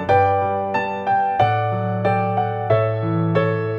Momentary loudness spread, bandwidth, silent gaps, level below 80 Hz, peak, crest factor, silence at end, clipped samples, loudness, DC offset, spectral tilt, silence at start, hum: 5 LU; 6.8 kHz; none; -54 dBFS; -4 dBFS; 14 dB; 0 s; under 0.1%; -20 LUFS; under 0.1%; -8.5 dB/octave; 0 s; none